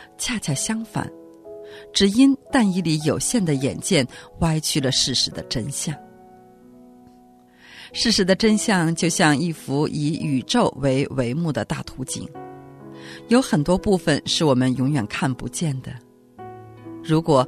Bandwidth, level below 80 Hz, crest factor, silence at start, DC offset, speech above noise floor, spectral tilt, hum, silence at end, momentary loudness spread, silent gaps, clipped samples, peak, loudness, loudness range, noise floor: 13.5 kHz; -46 dBFS; 18 dB; 0 s; under 0.1%; 30 dB; -4.5 dB/octave; none; 0 s; 21 LU; none; under 0.1%; -4 dBFS; -21 LUFS; 4 LU; -51 dBFS